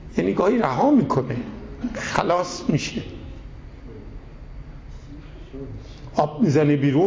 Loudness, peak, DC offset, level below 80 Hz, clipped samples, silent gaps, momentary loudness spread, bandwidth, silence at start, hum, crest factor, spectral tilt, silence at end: -22 LUFS; -4 dBFS; under 0.1%; -42 dBFS; under 0.1%; none; 23 LU; 8 kHz; 0 s; none; 18 dB; -6.5 dB/octave; 0 s